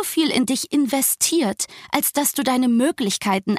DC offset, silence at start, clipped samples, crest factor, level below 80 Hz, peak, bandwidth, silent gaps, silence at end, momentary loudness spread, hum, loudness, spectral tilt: under 0.1%; 0 s; under 0.1%; 20 dB; -62 dBFS; 0 dBFS; 15.5 kHz; none; 0 s; 4 LU; none; -20 LUFS; -3 dB/octave